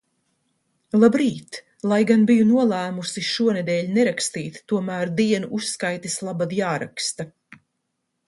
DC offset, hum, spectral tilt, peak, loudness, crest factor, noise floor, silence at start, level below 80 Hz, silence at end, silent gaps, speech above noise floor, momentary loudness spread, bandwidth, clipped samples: under 0.1%; none; -5 dB/octave; -2 dBFS; -21 LUFS; 20 dB; -76 dBFS; 0.95 s; -66 dBFS; 1 s; none; 55 dB; 11 LU; 11.5 kHz; under 0.1%